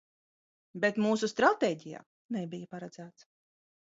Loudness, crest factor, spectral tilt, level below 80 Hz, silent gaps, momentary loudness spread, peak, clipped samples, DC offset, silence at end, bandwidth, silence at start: -30 LUFS; 24 dB; -5 dB/octave; -76 dBFS; 2.06-2.29 s; 23 LU; -10 dBFS; under 0.1%; under 0.1%; 0.75 s; 7.8 kHz; 0.75 s